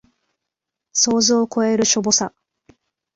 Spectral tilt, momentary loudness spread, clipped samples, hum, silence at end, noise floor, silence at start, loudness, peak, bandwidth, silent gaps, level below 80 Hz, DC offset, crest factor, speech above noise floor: -2.5 dB/octave; 6 LU; under 0.1%; none; 0.85 s; -83 dBFS; 0.95 s; -17 LUFS; -2 dBFS; 8 kHz; none; -58 dBFS; under 0.1%; 18 dB; 65 dB